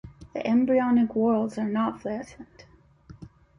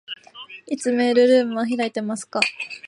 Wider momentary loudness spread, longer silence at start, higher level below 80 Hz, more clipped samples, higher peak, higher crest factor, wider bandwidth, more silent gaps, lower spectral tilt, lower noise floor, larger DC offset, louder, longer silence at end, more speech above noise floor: second, 14 LU vs 19 LU; about the same, 0.05 s vs 0.1 s; first, -58 dBFS vs -74 dBFS; neither; second, -12 dBFS vs 0 dBFS; second, 14 dB vs 20 dB; second, 9.8 kHz vs 11 kHz; neither; first, -7.5 dB/octave vs -3.5 dB/octave; first, -51 dBFS vs -42 dBFS; neither; second, -25 LUFS vs -20 LUFS; first, 0.3 s vs 0 s; first, 27 dB vs 22 dB